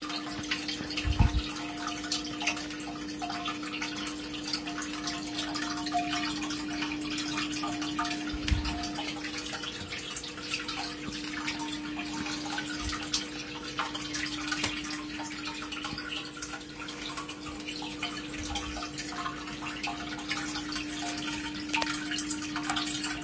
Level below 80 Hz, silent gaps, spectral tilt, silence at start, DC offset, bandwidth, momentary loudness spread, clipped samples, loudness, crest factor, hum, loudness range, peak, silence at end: -44 dBFS; none; -3 dB/octave; 0 s; under 0.1%; 8 kHz; 6 LU; under 0.1%; -34 LUFS; 24 dB; none; 4 LU; -10 dBFS; 0 s